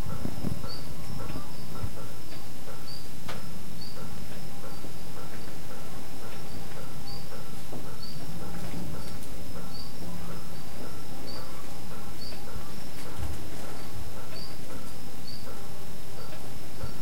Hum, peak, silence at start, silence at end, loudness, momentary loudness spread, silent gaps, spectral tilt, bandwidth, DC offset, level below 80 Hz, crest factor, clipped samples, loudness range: none; -14 dBFS; 0 s; 0 s; -41 LUFS; 4 LU; none; -5 dB/octave; 16.5 kHz; 10%; -50 dBFS; 22 dB; under 0.1%; 2 LU